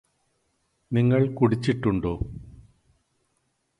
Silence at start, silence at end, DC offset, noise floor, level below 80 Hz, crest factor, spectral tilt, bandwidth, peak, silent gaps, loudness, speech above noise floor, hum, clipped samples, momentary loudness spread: 0.9 s; 1.3 s; under 0.1%; -73 dBFS; -46 dBFS; 18 dB; -8.5 dB/octave; 10.5 kHz; -8 dBFS; none; -24 LUFS; 50 dB; none; under 0.1%; 13 LU